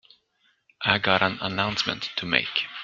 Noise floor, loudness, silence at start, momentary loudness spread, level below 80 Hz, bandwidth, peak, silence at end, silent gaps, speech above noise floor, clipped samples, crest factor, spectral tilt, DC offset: -68 dBFS; -24 LUFS; 0.8 s; 7 LU; -60 dBFS; 7.8 kHz; -2 dBFS; 0 s; none; 43 dB; under 0.1%; 26 dB; -4 dB/octave; under 0.1%